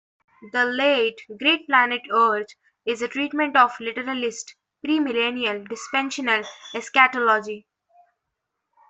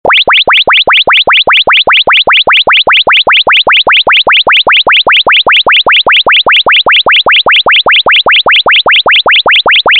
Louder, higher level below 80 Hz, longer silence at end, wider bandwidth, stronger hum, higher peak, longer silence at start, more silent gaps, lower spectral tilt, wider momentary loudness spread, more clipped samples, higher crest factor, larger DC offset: second, -21 LUFS vs -3 LUFS; second, -72 dBFS vs -40 dBFS; first, 1.3 s vs 0 s; second, 8.4 kHz vs 14 kHz; neither; about the same, -2 dBFS vs 0 dBFS; first, 0.4 s vs 0.05 s; neither; about the same, -2 dB/octave vs -3 dB/octave; first, 15 LU vs 0 LU; neither; first, 20 dB vs 6 dB; second, under 0.1% vs 0.1%